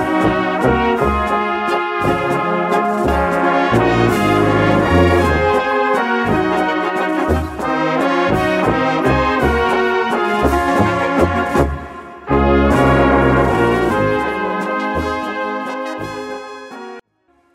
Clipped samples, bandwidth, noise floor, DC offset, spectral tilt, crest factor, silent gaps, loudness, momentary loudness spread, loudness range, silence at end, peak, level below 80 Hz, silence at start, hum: under 0.1%; 16 kHz; -59 dBFS; under 0.1%; -6.5 dB/octave; 12 dB; none; -15 LUFS; 9 LU; 3 LU; 0.55 s; -2 dBFS; -30 dBFS; 0 s; none